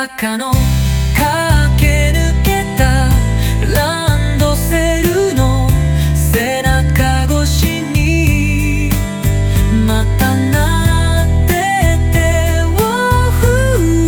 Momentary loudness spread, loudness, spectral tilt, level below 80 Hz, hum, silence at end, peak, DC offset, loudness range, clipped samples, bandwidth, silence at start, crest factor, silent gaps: 3 LU; -13 LUFS; -5.5 dB/octave; -16 dBFS; none; 0 s; 0 dBFS; under 0.1%; 1 LU; under 0.1%; over 20 kHz; 0 s; 12 dB; none